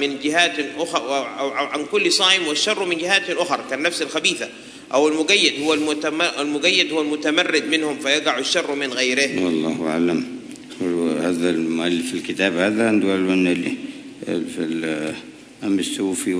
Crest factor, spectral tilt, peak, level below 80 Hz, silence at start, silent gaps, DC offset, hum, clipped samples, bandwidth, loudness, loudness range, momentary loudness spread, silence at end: 20 dB; -3 dB/octave; 0 dBFS; -66 dBFS; 0 s; none; under 0.1%; none; under 0.1%; 11 kHz; -20 LUFS; 3 LU; 10 LU; 0 s